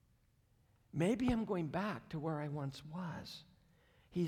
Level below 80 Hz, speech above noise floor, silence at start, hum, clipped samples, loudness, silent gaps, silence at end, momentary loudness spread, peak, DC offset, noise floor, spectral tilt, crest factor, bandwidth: -62 dBFS; 34 dB; 0.95 s; none; under 0.1%; -40 LUFS; none; 0 s; 12 LU; -22 dBFS; under 0.1%; -73 dBFS; -7 dB/octave; 18 dB; 15 kHz